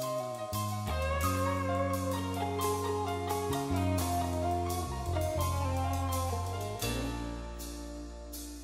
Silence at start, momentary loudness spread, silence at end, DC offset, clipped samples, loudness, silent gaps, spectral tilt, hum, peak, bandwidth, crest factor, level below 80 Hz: 0 s; 11 LU; 0 s; under 0.1%; under 0.1%; -34 LUFS; none; -5.5 dB/octave; none; -18 dBFS; 16 kHz; 14 dB; -44 dBFS